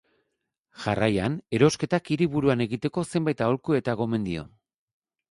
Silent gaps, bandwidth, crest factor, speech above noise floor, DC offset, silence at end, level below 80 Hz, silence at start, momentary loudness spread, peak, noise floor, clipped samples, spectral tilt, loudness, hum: none; 11.5 kHz; 20 dB; 55 dB; under 0.1%; 0.85 s; -54 dBFS; 0.8 s; 7 LU; -6 dBFS; -80 dBFS; under 0.1%; -6.5 dB/octave; -26 LUFS; none